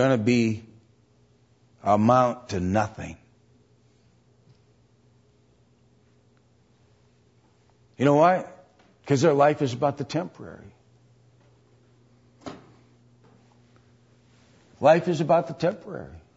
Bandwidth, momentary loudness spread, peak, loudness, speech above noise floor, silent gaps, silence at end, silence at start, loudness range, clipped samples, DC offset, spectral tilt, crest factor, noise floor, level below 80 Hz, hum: 8 kHz; 24 LU; -6 dBFS; -23 LUFS; 39 dB; none; 0.2 s; 0 s; 10 LU; under 0.1%; under 0.1%; -6.5 dB/octave; 20 dB; -61 dBFS; -62 dBFS; none